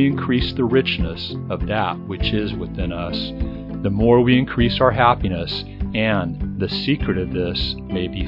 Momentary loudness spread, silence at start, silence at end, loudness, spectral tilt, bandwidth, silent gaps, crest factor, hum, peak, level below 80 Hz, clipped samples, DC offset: 11 LU; 0 s; 0 s; -20 LUFS; -8.5 dB/octave; 5.8 kHz; none; 20 dB; none; 0 dBFS; -32 dBFS; under 0.1%; under 0.1%